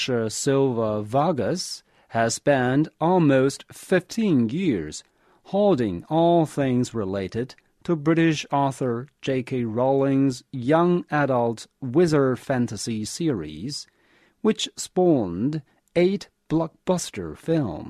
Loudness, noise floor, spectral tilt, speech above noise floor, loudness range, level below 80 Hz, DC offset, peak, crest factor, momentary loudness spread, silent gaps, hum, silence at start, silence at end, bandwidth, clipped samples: -23 LUFS; -61 dBFS; -6 dB/octave; 38 dB; 3 LU; -56 dBFS; under 0.1%; -6 dBFS; 16 dB; 10 LU; none; none; 0 s; 0 s; 13.5 kHz; under 0.1%